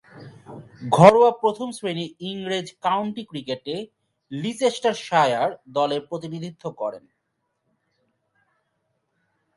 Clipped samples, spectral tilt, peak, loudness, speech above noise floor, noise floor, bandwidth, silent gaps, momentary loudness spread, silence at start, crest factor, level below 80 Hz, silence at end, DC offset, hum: under 0.1%; -5.5 dB/octave; 0 dBFS; -22 LUFS; 54 dB; -76 dBFS; 11.5 kHz; none; 19 LU; 0.15 s; 24 dB; -68 dBFS; 2.6 s; under 0.1%; none